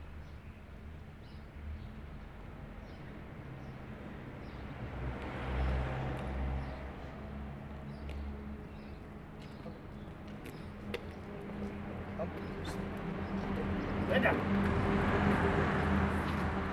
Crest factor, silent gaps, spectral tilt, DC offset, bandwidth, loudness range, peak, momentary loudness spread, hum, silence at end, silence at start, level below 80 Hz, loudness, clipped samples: 22 dB; none; -7.5 dB/octave; under 0.1%; 13.5 kHz; 16 LU; -16 dBFS; 18 LU; none; 0 s; 0 s; -44 dBFS; -37 LUFS; under 0.1%